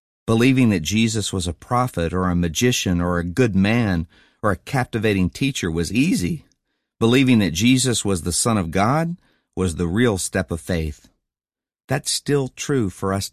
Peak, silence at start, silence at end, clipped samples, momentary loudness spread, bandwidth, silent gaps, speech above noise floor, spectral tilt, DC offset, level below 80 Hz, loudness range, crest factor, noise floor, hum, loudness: -4 dBFS; 0.25 s; 0.05 s; under 0.1%; 9 LU; 14 kHz; 11.84-11.88 s; over 70 dB; -5 dB/octave; 0.1%; -38 dBFS; 4 LU; 16 dB; under -90 dBFS; none; -20 LUFS